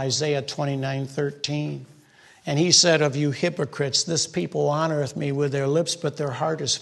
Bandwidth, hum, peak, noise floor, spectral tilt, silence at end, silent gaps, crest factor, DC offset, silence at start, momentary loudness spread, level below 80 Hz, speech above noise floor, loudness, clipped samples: 12 kHz; none; -4 dBFS; -53 dBFS; -3.5 dB/octave; 0 s; none; 20 dB; under 0.1%; 0 s; 11 LU; -66 dBFS; 30 dB; -23 LUFS; under 0.1%